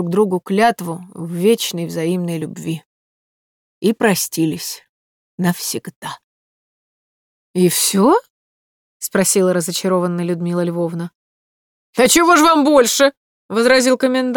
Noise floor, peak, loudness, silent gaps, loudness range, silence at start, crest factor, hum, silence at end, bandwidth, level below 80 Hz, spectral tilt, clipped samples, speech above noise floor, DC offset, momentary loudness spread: under -90 dBFS; -2 dBFS; -16 LUFS; 2.86-3.81 s, 4.89-5.38 s, 5.96-6.02 s, 6.24-7.54 s, 8.30-9.00 s, 11.15-11.93 s, 13.17-13.49 s; 7 LU; 0 s; 16 dB; none; 0 s; over 20 kHz; -58 dBFS; -4 dB/octave; under 0.1%; over 74 dB; under 0.1%; 16 LU